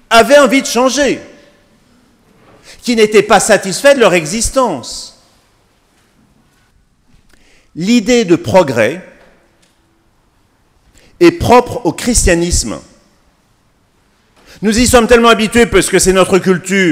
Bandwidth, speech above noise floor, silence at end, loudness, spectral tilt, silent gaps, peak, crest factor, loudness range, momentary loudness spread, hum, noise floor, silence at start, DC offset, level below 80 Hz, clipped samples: 16.5 kHz; 44 dB; 0 s; -10 LUFS; -4 dB/octave; none; 0 dBFS; 12 dB; 6 LU; 14 LU; none; -54 dBFS; 0.1 s; under 0.1%; -30 dBFS; 0.7%